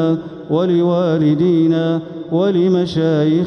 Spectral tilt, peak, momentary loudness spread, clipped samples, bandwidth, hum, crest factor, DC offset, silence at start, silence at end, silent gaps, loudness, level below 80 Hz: -9 dB/octave; -4 dBFS; 7 LU; under 0.1%; 6.4 kHz; none; 10 dB; under 0.1%; 0 s; 0 s; none; -16 LUFS; -54 dBFS